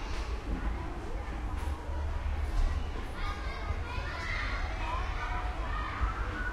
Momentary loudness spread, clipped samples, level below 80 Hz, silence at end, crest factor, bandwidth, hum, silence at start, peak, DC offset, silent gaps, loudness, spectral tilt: 4 LU; under 0.1%; -34 dBFS; 0 s; 16 dB; 11.5 kHz; none; 0 s; -18 dBFS; under 0.1%; none; -36 LUFS; -5.5 dB/octave